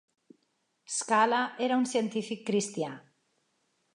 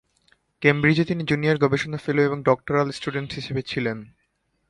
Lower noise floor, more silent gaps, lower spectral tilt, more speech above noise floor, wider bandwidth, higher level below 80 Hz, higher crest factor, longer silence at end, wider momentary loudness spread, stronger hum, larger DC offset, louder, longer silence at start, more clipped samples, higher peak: first, -76 dBFS vs -64 dBFS; neither; second, -3.5 dB/octave vs -7 dB/octave; first, 47 dB vs 41 dB; about the same, 11.5 kHz vs 11.5 kHz; second, -86 dBFS vs -56 dBFS; about the same, 20 dB vs 22 dB; first, 0.95 s vs 0.65 s; about the same, 11 LU vs 9 LU; neither; neither; second, -29 LUFS vs -23 LUFS; first, 0.9 s vs 0.6 s; neither; second, -12 dBFS vs -2 dBFS